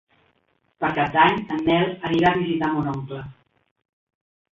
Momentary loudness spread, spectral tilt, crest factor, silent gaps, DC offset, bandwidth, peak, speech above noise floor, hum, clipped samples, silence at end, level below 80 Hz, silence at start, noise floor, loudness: 14 LU; -7.5 dB/octave; 20 dB; none; under 0.1%; 7.2 kHz; -4 dBFS; 46 dB; none; under 0.1%; 1.2 s; -54 dBFS; 0.8 s; -67 dBFS; -21 LUFS